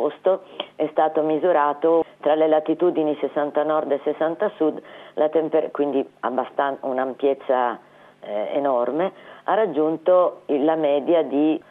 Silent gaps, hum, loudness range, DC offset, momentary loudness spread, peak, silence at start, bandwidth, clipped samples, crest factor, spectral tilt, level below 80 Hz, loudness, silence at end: none; none; 3 LU; under 0.1%; 7 LU; -6 dBFS; 0 s; 4 kHz; under 0.1%; 14 dB; -8 dB/octave; -78 dBFS; -22 LUFS; 0.1 s